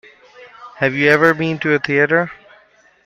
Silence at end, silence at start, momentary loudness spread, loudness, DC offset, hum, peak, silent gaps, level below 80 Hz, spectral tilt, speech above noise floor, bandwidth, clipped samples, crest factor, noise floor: 0.7 s; 0.4 s; 8 LU; -15 LUFS; under 0.1%; none; 0 dBFS; none; -58 dBFS; -6.5 dB/octave; 37 dB; 15.5 kHz; under 0.1%; 18 dB; -52 dBFS